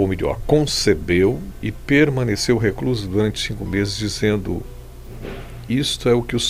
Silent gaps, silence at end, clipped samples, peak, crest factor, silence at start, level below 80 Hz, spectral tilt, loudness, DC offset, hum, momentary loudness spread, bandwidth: none; 0 s; under 0.1%; -2 dBFS; 16 dB; 0 s; -34 dBFS; -5 dB/octave; -20 LUFS; under 0.1%; none; 17 LU; 16 kHz